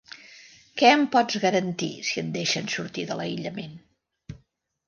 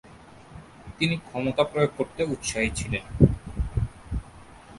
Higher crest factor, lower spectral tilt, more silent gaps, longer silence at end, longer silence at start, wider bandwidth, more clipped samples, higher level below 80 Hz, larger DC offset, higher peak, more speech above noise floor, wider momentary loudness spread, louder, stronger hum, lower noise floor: about the same, 22 dB vs 26 dB; second, -4 dB/octave vs -5.5 dB/octave; neither; first, 0.5 s vs 0 s; first, 0.25 s vs 0.05 s; second, 10 kHz vs 11.5 kHz; neither; second, -64 dBFS vs -38 dBFS; neither; about the same, -4 dBFS vs -2 dBFS; first, 42 dB vs 24 dB; about the same, 25 LU vs 23 LU; first, -24 LUFS vs -27 LUFS; neither; first, -67 dBFS vs -48 dBFS